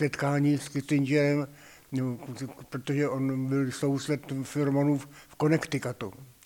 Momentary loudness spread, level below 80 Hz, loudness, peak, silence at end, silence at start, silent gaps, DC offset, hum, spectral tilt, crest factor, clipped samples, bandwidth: 13 LU; -66 dBFS; -29 LUFS; -12 dBFS; 0.2 s; 0 s; none; under 0.1%; none; -6.5 dB/octave; 16 dB; under 0.1%; 18 kHz